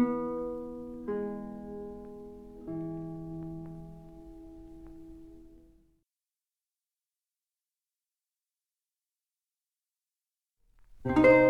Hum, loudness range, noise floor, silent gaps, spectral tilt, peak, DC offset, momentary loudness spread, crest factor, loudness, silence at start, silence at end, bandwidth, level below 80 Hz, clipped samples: none; 18 LU; under -90 dBFS; none; -8.5 dB/octave; -10 dBFS; under 0.1%; 20 LU; 24 dB; -33 LUFS; 0 s; 0 s; 7.2 kHz; -56 dBFS; under 0.1%